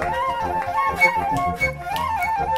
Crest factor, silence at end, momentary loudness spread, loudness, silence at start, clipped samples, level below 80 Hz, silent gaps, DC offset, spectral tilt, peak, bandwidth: 16 dB; 0 s; 7 LU; -21 LUFS; 0 s; under 0.1%; -40 dBFS; none; under 0.1%; -4.5 dB/octave; -4 dBFS; 16 kHz